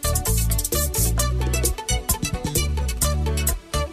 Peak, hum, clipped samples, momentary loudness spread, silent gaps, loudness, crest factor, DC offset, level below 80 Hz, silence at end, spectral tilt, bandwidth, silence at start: -6 dBFS; none; under 0.1%; 3 LU; none; -22 LUFS; 16 dB; under 0.1%; -26 dBFS; 0 s; -3.5 dB/octave; 15.5 kHz; 0 s